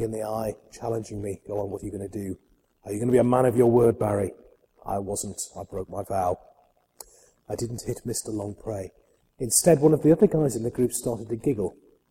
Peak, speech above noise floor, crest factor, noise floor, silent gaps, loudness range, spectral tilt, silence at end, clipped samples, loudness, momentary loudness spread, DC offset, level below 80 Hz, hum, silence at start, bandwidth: -6 dBFS; 37 dB; 20 dB; -62 dBFS; none; 9 LU; -6 dB/octave; 0.4 s; under 0.1%; -25 LUFS; 16 LU; under 0.1%; -52 dBFS; none; 0 s; 16.5 kHz